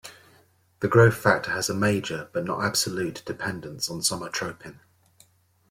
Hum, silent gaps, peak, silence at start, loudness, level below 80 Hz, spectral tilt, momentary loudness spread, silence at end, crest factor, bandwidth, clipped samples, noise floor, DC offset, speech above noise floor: none; none; -4 dBFS; 0.05 s; -25 LUFS; -60 dBFS; -4 dB/octave; 13 LU; 1 s; 22 dB; 16.5 kHz; under 0.1%; -60 dBFS; under 0.1%; 36 dB